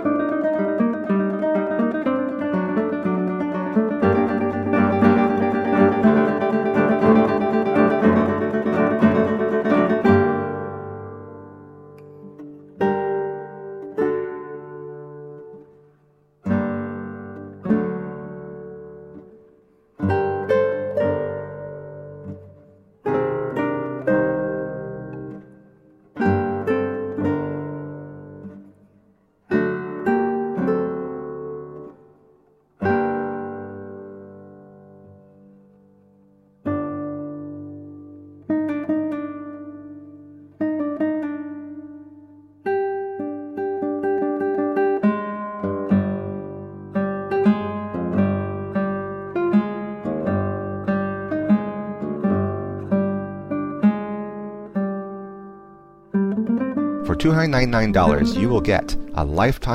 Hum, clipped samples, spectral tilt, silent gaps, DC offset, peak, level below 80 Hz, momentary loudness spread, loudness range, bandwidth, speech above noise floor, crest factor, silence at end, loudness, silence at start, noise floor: none; under 0.1%; -8.5 dB/octave; none; under 0.1%; -2 dBFS; -42 dBFS; 20 LU; 11 LU; 9.2 kHz; 41 dB; 20 dB; 0 s; -22 LUFS; 0 s; -59 dBFS